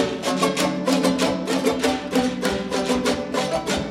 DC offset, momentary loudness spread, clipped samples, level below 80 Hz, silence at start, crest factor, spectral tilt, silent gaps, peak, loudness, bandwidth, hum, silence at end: under 0.1%; 3 LU; under 0.1%; -46 dBFS; 0 s; 16 dB; -4 dB/octave; none; -6 dBFS; -22 LUFS; 16.5 kHz; none; 0 s